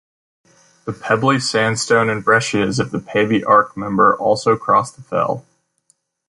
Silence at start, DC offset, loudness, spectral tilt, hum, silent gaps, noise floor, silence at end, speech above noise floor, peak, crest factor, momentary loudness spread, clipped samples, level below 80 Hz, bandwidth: 0.85 s; under 0.1%; -16 LUFS; -4.5 dB/octave; none; none; -62 dBFS; 0.9 s; 46 dB; -2 dBFS; 16 dB; 9 LU; under 0.1%; -54 dBFS; 11.5 kHz